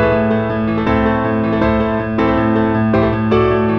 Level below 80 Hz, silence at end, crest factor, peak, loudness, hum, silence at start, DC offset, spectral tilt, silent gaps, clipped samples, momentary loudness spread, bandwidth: -30 dBFS; 0 s; 12 dB; -2 dBFS; -15 LUFS; none; 0 s; under 0.1%; -9.5 dB/octave; none; under 0.1%; 3 LU; 5.8 kHz